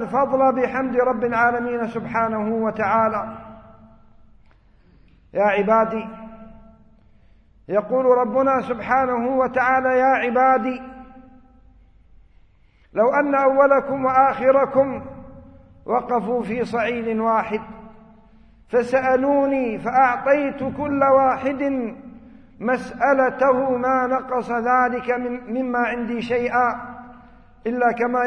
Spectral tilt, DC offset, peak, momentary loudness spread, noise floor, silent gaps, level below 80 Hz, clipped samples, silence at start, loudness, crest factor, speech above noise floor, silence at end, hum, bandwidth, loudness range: -7 dB/octave; under 0.1%; -2 dBFS; 12 LU; -54 dBFS; none; -52 dBFS; under 0.1%; 0 s; -20 LUFS; 18 dB; 35 dB; 0 s; none; 9.2 kHz; 6 LU